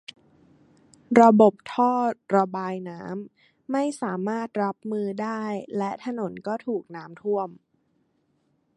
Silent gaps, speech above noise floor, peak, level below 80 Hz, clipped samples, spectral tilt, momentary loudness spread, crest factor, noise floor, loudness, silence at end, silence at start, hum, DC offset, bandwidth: none; 46 dB; -2 dBFS; -74 dBFS; under 0.1%; -7 dB/octave; 17 LU; 24 dB; -69 dBFS; -24 LUFS; 1.2 s; 1.1 s; none; under 0.1%; 11 kHz